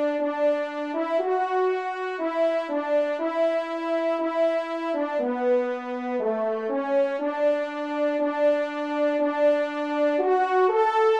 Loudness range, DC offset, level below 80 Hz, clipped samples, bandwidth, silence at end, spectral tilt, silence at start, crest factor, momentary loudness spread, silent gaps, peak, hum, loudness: 2 LU; under 0.1%; -78 dBFS; under 0.1%; 8.4 kHz; 0 s; -4.5 dB/octave; 0 s; 14 dB; 6 LU; none; -10 dBFS; none; -25 LUFS